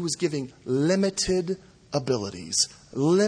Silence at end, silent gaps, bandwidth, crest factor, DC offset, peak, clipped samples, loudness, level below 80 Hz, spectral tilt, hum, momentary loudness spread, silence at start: 0 s; none; 10.5 kHz; 16 dB; under 0.1%; -10 dBFS; under 0.1%; -26 LUFS; -54 dBFS; -4.5 dB/octave; none; 9 LU; 0 s